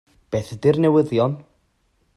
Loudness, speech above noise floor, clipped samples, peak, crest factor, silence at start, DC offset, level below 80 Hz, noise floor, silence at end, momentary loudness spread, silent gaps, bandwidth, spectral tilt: -20 LUFS; 46 dB; under 0.1%; -4 dBFS; 18 dB; 0.3 s; under 0.1%; -56 dBFS; -65 dBFS; 0.75 s; 11 LU; none; 12 kHz; -8 dB/octave